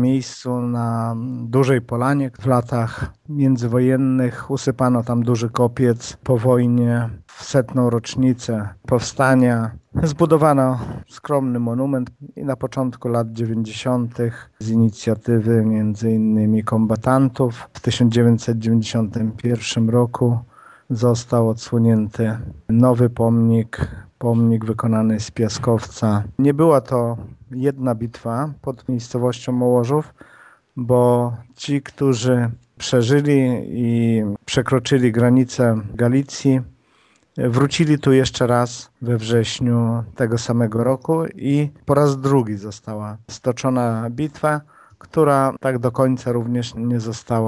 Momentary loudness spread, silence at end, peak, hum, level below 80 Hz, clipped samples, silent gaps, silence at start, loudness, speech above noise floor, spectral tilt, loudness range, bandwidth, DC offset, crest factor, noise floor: 10 LU; 0 s; 0 dBFS; none; -48 dBFS; under 0.1%; none; 0 s; -19 LUFS; 39 dB; -7 dB/octave; 3 LU; 11 kHz; under 0.1%; 18 dB; -58 dBFS